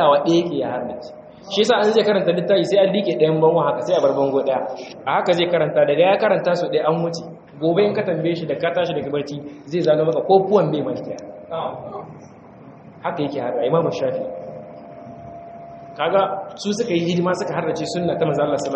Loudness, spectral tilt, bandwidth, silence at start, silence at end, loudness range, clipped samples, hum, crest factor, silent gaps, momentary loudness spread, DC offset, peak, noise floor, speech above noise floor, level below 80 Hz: -19 LUFS; -6 dB/octave; 8.2 kHz; 0 s; 0 s; 7 LU; under 0.1%; none; 18 dB; none; 19 LU; under 0.1%; -2 dBFS; -42 dBFS; 23 dB; -62 dBFS